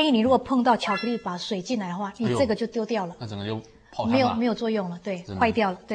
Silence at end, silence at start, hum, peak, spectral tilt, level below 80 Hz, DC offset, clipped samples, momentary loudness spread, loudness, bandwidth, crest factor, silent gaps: 0 s; 0 s; none; -8 dBFS; -6 dB/octave; -56 dBFS; under 0.1%; under 0.1%; 11 LU; -25 LUFS; 10 kHz; 16 dB; none